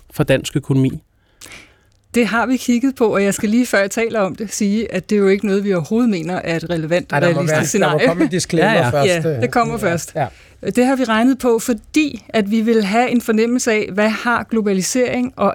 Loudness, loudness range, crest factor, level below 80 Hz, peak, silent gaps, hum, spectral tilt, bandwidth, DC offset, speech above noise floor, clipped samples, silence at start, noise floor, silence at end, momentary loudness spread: -17 LUFS; 2 LU; 14 dB; -48 dBFS; -2 dBFS; none; none; -5 dB/octave; 19 kHz; under 0.1%; 35 dB; under 0.1%; 0.15 s; -52 dBFS; 0 s; 6 LU